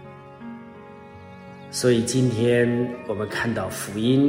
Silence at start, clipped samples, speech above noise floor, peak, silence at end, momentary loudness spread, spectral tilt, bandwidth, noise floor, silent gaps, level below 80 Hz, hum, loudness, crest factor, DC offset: 0 s; under 0.1%; 21 dB; -6 dBFS; 0 s; 23 LU; -5.5 dB/octave; 16 kHz; -42 dBFS; none; -58 dBFS; none; -23 LUFS; 18 dB; under 0.1%